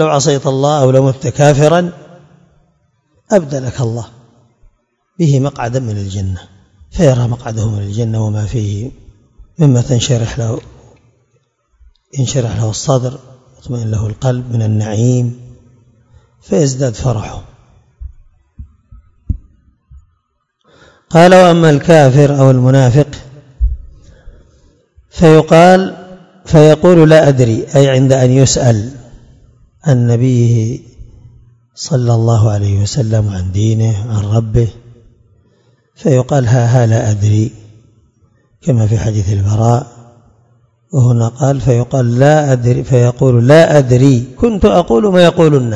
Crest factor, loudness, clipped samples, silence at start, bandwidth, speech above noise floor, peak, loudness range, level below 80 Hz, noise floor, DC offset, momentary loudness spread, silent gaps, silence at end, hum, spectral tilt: 12 dB; -11 LUFS; 1%; 0 s; 9.8 kHz; 54 dB; 0 dBFS; 10 LU; -34 dBFS; -64 dBFS; under 0.1%; 14 LU; none; 0 s; none; -6.5 dB/octave